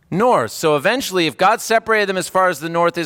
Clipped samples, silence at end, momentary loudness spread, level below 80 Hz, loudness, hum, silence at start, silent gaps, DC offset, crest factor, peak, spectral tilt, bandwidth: under 0.1%; 0 s; 3 LU; -58 dBFS; -17 LUFS; none; 0.1 s; none; under 0.1%; 14 dB; -4 dBFS; -4 dB/octave; 17.5 kHz